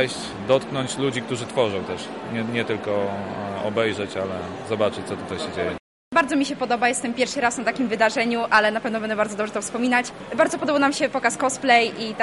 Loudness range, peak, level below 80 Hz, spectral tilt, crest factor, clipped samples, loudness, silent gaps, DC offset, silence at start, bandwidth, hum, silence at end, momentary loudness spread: 5 LU; -4 dBFS; -60 dBFS; -4 dB/octave; 18 dB; under 0.1%; -23 LUFS; 5.80-6.11 s; under 0.1%; 0 s; 11.5 kHz; none; 0 s; 11 LU